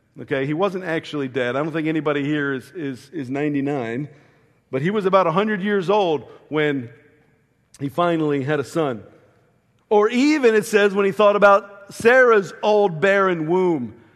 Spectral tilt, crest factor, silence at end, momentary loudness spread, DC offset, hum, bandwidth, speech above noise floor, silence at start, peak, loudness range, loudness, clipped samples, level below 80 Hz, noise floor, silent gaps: -6 dB/octave; 18 dB; 0.2 s; 13 LU; under 0.1%; none; 13 kHz; 42 dB; 0.15 s; -2 dBFS; 8 LU; -19 LUFS; under 0.1%; -66 dBFS; -61 dBFS; none